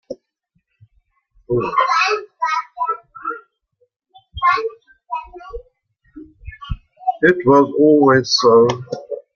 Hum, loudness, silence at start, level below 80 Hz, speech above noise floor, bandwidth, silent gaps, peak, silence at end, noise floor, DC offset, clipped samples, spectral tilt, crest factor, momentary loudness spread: none; -16 LUFS; 0.1 s; -44 dBFS; 55 dB; 7 kHz; 3.96-4.00 s; -2 dBFS; 0.15 s; -68 dBFS; under 0.1%; under 0.1%; -5 dB/octave; 18 dB; 24 LU